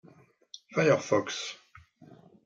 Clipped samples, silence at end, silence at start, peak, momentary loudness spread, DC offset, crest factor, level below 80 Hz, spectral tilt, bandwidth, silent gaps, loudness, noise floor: under 0.1%; 0.3 s; 0.7 s; -10 dBFS; 24 LU; under 0.1%; 20 dB; -74 dBFS; -4.5 dB/octave; 7.6 kHz; none; -28 LUFS; -59 dBFS